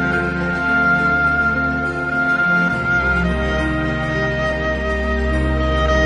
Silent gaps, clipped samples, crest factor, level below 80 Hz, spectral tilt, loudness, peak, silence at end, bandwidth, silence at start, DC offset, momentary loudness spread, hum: none; under 0.1%; 12 dB; -26 dBFS; -6.5 dB/octave; -18 LUFS; -4 dBFS; 0 s; 10 kHz; 0 s; under 0.1%; 5 LU; none